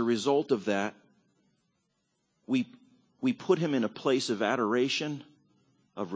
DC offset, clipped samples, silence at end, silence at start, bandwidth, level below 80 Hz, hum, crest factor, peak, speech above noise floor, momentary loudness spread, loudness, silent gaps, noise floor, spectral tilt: under 0.1%; under 0.1%; 0 s; 0 s; 8 kHz; -78 dBFS; none; 20 dB; -12 dBFS; 49 dB; 11 LU; -29 LUFS; none; -77 dBFS; -5 dB/octave